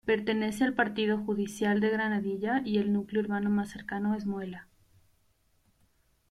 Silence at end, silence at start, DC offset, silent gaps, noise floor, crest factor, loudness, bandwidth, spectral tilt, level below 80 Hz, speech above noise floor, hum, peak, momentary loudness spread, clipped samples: 1.65 s; 0.05 s; under 0.1%; none; -69 dBFS; 18 dB; -30 LUFS; 13 kHz; -6 dB/octave; -64 dBFS; 40 dB; none; -14 dBFS; 7 LU; under 0.1%